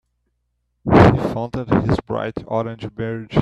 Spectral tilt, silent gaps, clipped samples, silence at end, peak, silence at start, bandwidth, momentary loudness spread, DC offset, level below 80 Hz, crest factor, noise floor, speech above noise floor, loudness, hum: -8.5 dB/octave; none; under 0.1%; 0 s; 0 dBFS; 0.85 s; 9.6 kHz; 15 LU; under 0.1%; -38 dBFS; 18 dB; -71 dBFS; 49 dB; -19 LUFS; none